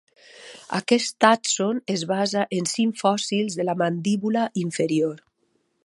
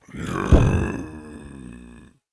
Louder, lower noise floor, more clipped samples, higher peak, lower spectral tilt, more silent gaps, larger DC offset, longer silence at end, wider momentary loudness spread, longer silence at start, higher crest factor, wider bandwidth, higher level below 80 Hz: about the same, -23 LUFS vs -21 LUFS; first, -70 dBFS vs -46 dBFS; neither; about the same, -2 dBFS vs -2 dBFS; second, -4 dB/octave vs -7.5 dB/octave; neither; neither; first, 0.7 s vs 0.55 s; second, 10 LU vs 23 LU; first, 0.35 s vs 0.15 s; about the same, 22 dB vs 20 dB; about the same, 11.5 kHz vs 11 kHz; second, -72 dBFS vs -28 dBFS